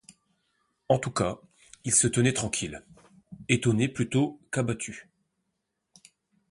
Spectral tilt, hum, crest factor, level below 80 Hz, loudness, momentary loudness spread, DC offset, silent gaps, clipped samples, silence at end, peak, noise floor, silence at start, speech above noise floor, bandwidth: -4.5 dB/octave; none; 24 dB; -56 dBFS; -27 LUFS; 16 LU; under 0.1%; none; under 0.1%; 1.5 s; -6 dBFS; -81 dBFS; 0.9 s; 54 dB; 11.5 kHz